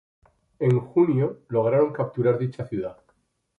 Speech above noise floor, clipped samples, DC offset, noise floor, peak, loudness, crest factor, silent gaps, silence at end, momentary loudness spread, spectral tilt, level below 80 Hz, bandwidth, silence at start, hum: 46 dB; under 0.1%; under 0.1%; -68 dBFS; -8 dBFS; -24 LUFS; 16 dB; none; 0.65 s; 10 LU; -10.5 dB/octave; -62 dBFS; 4.7 kHz; 0.6 s; none